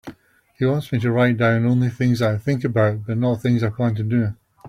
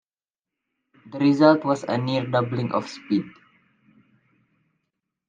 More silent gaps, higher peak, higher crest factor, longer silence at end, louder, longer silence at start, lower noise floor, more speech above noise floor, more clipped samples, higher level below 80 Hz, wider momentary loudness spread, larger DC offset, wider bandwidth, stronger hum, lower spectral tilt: neither; about the same, -4 dBFS vs -2 dBFS; second, 16 dB vs 22 dB; second, 0 s vs 2 s; about the same, -20 LUFS vs -22 LUFS; second, 0.05 s vs 1.05 s; second, -51 dBFS vs under -90 dBFS; second, 32 dB vs over 69 dB; neither; first, -54 dBFS vs -72 dBFS; second, 5 LU vs 11 LU; neither; first, 12.5 kHz vs 7.6 kHz; neither; about the same, -8 dB/octave vs -7 dB/octave